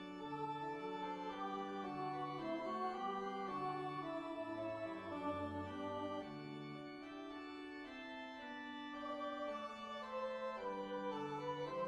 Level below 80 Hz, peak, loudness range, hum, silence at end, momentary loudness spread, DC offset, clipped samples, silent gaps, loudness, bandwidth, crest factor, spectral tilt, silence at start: -76 dBFS; -30 dBFS; 5 LU; none; 0 s; 7 LU; under 0.1%; under 0.1%; none; -46 LUFS; 11 kHz; 14 dB; -6 dB/octave; 0 s